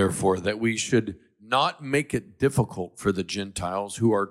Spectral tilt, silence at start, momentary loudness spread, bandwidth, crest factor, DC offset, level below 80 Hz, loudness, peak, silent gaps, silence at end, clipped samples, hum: -5 dB/octave; 0 s; 6 LU; 15.5 kHz; 16 dB; under 0.1%; -54 dBFS; -26 LUFS; -10 dBFS; none; 0 s; under 0.1%; none